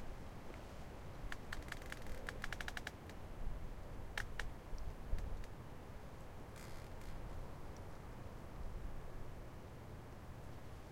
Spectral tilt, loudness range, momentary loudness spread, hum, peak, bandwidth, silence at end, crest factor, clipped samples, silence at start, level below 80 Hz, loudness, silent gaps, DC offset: -5 dB/octave; 5 LU; 7 LU; none; -26 dBFS; 16.5 kHz; 0 s; 22 dB; under 0.1%; 0 s; -50 dBFS; -51 LUFS; none; under 0.1%